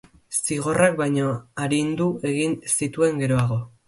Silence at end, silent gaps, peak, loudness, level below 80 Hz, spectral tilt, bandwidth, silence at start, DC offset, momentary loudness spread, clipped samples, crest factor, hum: 0.2 s; none; -4 dBFS; -23 LUFS; -56 dBFS; -5 dB/octave; 12 kHz; 0.3 s; under 0.1%; 6 LU; under 0.1%; 20 dB; none